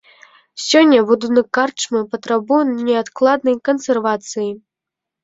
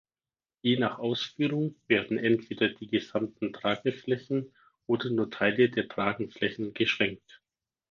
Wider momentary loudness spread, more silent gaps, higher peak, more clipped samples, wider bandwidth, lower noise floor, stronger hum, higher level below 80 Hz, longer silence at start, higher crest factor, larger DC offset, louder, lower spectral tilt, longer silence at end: first, 12 LU vs 7 LU; neither; first, -2 dBFS vs -10 dBFS; neither; first, 8 kHz vs 7 kHz; second, -84 dBFS vs under -90 dBFS; neither; about the same, -64 dBFS vs -68 dBFS; about the same, 0.55 s vs 0.65 s; about the same, 16 dB vs 20 dB; neither; first, -16 LUFS vs -29 LUFS; second, -3.5 dB/octave vs -6.5 dB/octave; about the same, 0.65 s vs 0.75 s